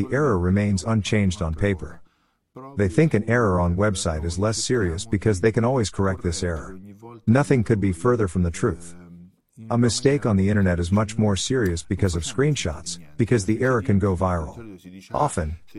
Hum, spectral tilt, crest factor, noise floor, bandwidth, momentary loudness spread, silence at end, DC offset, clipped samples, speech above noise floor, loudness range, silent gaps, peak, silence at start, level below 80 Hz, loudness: none; -6 dB/octave; 18 dB; -65 dBFS; 12 kHz; 11 LU; 0 s; 0.4%; under 0.1%; 44 dB; 2 LU; none; -4 dBFS; 0 s; -40 dBFS; -22 LUFS